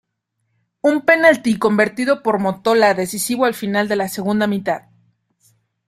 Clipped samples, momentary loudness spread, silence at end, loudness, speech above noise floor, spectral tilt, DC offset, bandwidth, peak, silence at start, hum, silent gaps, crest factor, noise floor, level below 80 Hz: under 0.1%; 8 LU; 1.1 s; -17 LUFS; 56 dB; -4.5 dB/octave; under 0.1%; 16 kHz; -2 dBFS; 0.85 s; none; none; 16 dB; -72 dBFS; -60 dBFS